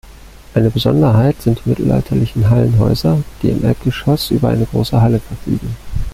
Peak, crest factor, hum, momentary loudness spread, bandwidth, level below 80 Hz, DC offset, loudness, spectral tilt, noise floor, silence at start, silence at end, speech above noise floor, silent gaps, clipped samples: -2 dBFS; 12 dB; none; 9 LU; 15.5 kHz; -30 dBFS; under 0.1%; -15 LUFS; -8 dB/octave; -37 dBFS; 0.05 s; 0 s; 23 dB; none; under 0.1%